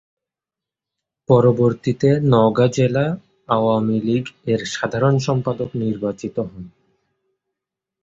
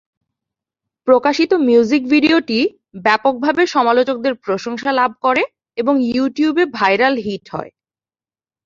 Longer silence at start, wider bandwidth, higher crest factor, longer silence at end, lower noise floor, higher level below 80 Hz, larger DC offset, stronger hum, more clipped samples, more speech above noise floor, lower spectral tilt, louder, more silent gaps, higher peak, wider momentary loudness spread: first, 1.3 s vs 1.05 s; about the same, 7.8 kHz vs 7.4 kHz; about the same, 18 dB vs 16 dB; first, 1.35 s vs 1 s; about the same, -88 dBFS vs under -90 dBFS; first, -52 dBFS vs -60 dBFS; neither; neither; neither; second, 70 dB vs over 75 dB; first, -7 dB/octave vs -5 dB/octave; second, -19 LUFS vs -16 LUFS; neither; about the same, -2 dBFS vs 0 dBFS; first, 12 LU vs 9 LU